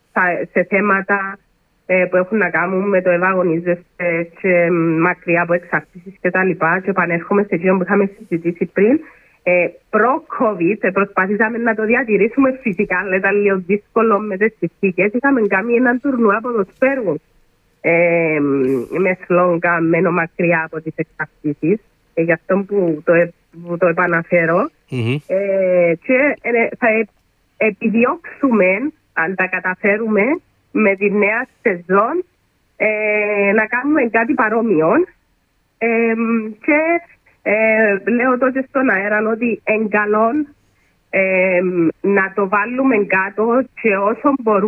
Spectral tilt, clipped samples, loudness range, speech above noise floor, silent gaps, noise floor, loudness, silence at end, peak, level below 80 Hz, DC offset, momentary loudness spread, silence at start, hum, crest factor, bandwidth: -9.5 dB/octave; under 0.1%; 1 LU; 46 dB; none; -62 dBFS; -16 LUFS; 0 s; -2 dBFS; -60 dBFS; under 0.1%; 6 LU; 0.15 s; none; 14 dB; 4.3 kHz